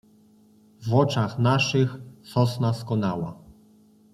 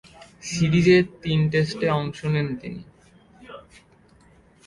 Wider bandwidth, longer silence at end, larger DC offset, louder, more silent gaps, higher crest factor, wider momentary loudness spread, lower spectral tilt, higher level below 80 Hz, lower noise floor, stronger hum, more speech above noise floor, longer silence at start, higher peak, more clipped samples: first, 13 kHz vs 11.5 kHz; second, 0.6 s vs 1.05 s; neither; about the same, -24 LUFS vs -22 LUFS; neither; about the same, 20 dB vs 18 dB; second, 12 LU vs 26 LU; about the same, -6.5 dB/octave vs -6.5 dB/octave; second, -60 dBFS vs -52 dBFS; about the same, -56 dBFS vs -55 dBFS; neither; about the same, 33 dB vs 34 dB; first, 0.8 s vs 0.45 s; about the same, -6 dBFS vs -6 dBFS; neither